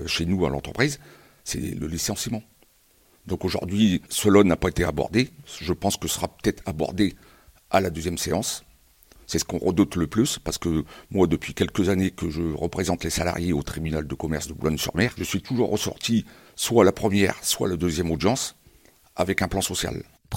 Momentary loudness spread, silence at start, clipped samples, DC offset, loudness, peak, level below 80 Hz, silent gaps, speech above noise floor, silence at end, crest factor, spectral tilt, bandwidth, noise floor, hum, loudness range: 8 LU; 0 s; under 0.1%; under 0.1%; -24 LUFS; -2 dBFS; -42 dBFS; none; 36 dB; 0 s; 22 dB; -4.5 dB/octave; 17 kHz; -60 dBFS; none; 4 LU